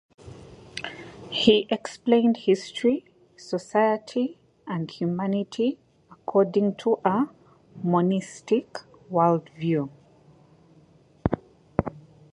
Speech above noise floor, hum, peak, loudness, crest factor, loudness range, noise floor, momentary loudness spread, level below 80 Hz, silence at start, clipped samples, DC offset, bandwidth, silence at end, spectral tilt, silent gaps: 33 dB; none; -2 dBFS; -25 LUFS; 24 dB; 4 LU; -56 dBFS; 17 LU; -52 dBFS; 0.25 s; under 0.1%; under 0.1%; 11 kHz; 0.35 s; -6.5 dB/octave; none